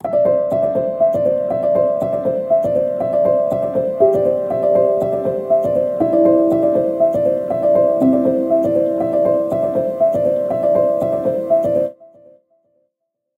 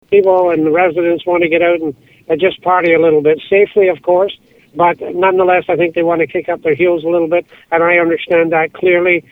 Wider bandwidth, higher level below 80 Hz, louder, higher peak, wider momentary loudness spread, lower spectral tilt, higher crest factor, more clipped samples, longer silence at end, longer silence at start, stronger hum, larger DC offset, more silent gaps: about the same, 4.3 kHz vs 4 kHz; about the same, -54 dBFS vs -54 dBFS; second, -16 LUFS vs -13 LUFS; about the same, -2 dBFS vs 0 dBFS; second, 4 LU vs 7 LU; first, -9.5 dB/octave vs -8 dB/octave; about the same, 14 dB vs 12 dB; neither; first, 1.35 s vs 0.1 s; about the same, 0.05 s vs 0.1 s; neither; neither; neither